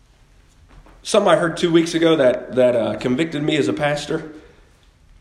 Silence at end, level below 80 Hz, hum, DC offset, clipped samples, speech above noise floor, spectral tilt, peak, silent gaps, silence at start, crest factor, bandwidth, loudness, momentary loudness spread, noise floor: 0.8 s; -52 dBFS; none; under 0.1%; under 0.1%; 34 dB; -5 dB/octave; -2 dBFS; none; 0.75 s; 18 dB; 12.5 kHz; -18 LUFS; 10 LU; -52 dBFS